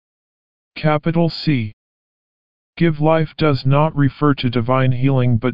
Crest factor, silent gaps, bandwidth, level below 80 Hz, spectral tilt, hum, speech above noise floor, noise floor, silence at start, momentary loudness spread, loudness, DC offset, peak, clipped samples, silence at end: 16 dB; 1.73-2.73 s; 5.4 kHz; -44 dBFS; -6.5 dB/octave; none; over 74 dB; under -90 dBFS; 0.7 s; 5 LU; -17 LUFS; 3%; -2 dBFS; under 0.1%; 0 s